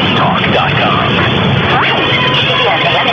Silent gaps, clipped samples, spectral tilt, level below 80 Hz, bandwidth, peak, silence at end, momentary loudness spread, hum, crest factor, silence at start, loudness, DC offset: none; under 0.1%; -6 dB/octave; -36 dBFS; 7.4 kHz; 0 dBFS; 0 s; 1 LU; none; 10 dB; 0 s; -10 LUFS; under 0.1%